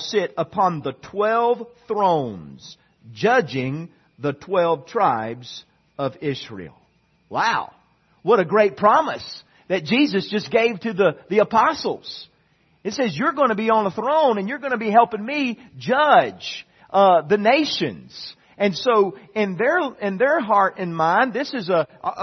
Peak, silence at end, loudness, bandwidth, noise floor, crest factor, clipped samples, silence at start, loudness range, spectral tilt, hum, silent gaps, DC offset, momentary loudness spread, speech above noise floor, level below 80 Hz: -2 dBFS; 0 s; -20 LUFS; 6.4 kHz; -61 dBFS; 20 dB; under 0.1%; 0 s; 5 LU; -5.5 dB/octave; none; none; under 0.1%; 15 LU; 41 dB; -66 dBFS